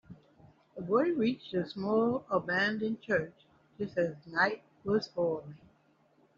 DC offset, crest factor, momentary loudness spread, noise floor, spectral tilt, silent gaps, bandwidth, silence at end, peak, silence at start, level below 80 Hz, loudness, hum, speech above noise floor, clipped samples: under 0.1%; 20 dB; 12 LU; -68 dBFS; -4 dB/octave; none; 7.2 kHz; 0.8 s; -14 dBFS; 0.1 s; -70 dBFS; -32 LUFS; none; 36 dB; under 0.1%